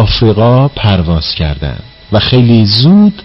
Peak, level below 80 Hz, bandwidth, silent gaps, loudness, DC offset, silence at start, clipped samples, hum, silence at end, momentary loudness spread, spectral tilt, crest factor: 0 dBFS; -24 dBFS; 5.8 kHz; none; -9 LUFS; under 0.1%; 0 s; under 0.1%; none; 0.05 s; 10 LU; -9 dB/octave; 8 dB